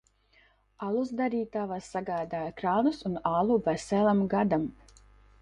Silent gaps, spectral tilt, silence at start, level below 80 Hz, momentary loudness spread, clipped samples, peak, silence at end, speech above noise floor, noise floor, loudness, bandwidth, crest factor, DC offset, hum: none; -7 dB/octave; 0.8 s; -60 dBFS; 9 LU; under 0.1%; -12 dBFS; 0.7 s; 36 dB; -64 dBFS; -29 LUFS; 10.5 kHz; 18 dB; under 0.1%; 50 Hz at -50 dBFS